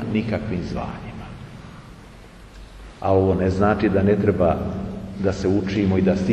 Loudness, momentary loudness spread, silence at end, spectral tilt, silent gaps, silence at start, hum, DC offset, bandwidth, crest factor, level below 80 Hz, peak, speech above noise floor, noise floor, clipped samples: -21 LUFS; 21 LU; 0 s; -8 dB/octave; none; 0 s; none; under 0.1%; 8.8 kHz; 16 dB; -40 dBFS; -6 dBFS; 23 dB; -43 dBFS; under 0.1%